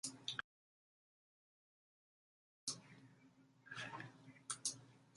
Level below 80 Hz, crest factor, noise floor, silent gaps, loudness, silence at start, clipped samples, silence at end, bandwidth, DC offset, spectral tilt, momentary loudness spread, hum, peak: -90 dBFS; 30 dB; -70 dBFS; 0.44-2.67 s; -48 LUFS; 0.05 s; under 0.1%; 0 s; 11.5 kHz; under 0.1%; -1 dB/octave; 22 LU; none; -24 dBFS